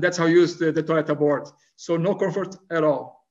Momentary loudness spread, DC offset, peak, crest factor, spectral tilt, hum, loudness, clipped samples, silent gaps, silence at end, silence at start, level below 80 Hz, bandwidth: 10 LU; under 0.1%; -6 dBFS; 16 dB; -6 dB/octave; none; -22 LUFS; under 0.1%; none; 0.2 s; 0 s; -72 dBFS; 7.8 kHz